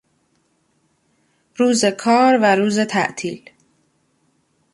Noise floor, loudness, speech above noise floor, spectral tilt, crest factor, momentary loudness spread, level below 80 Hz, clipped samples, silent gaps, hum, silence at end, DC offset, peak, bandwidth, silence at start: -64 dBFS; -17 LUFS; 48 dB; -4 dB/octave; 18 dB; 15 LU; -66 dBFS; under 0.1%; none; none; 1.35 s; under 0.1%; -4 dBFS; 11.5 kHz; 1.6 s